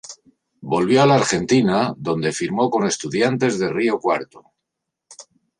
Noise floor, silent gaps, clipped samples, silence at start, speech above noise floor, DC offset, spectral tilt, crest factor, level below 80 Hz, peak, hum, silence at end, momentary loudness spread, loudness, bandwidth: -81 dBFS; none; under 0.1%; 0.05 s; 63 dB; under 0.1%; -5 dB/octave; 18 dB; -56 dBFS; -2 dBFS; none; 0.4 s; 9 LU; -19 LUFS; 11 kHz